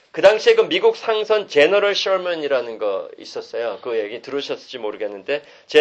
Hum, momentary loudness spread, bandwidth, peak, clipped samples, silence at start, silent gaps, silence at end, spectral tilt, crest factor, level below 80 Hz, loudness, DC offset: none; 13 LU; 8.4 kHz; 0 dBFS; under 0.1%; 0.15 s; none; 0 s; -3 dB/octave; 18 dB; -66 dBFS; -19 LUFS; under 0.1%